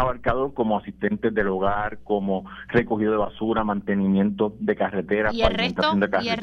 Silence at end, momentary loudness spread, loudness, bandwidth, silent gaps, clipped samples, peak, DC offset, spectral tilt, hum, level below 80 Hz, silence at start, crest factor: 0 s; 4 LU; -23 LUFS; 6.6 kHz; none; under 0.1%; -4 dBFS; under 0.1%; -7.5 dB/octave; none; -40 dBFS; 0 s; 20 dB